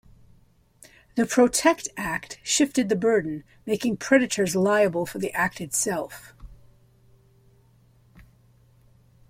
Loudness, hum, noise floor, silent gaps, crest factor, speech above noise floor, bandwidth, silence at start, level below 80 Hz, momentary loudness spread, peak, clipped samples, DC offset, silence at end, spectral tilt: -24 LUFS; none; -58 dBFS; none; 20 dB; 35 dB; 16.5 kHz; 1.15 s; -56 dBFS; 11 LU; -6 dBFS; under 0.1%; under 0.1%; 2.8 s; -3.5 dB/octave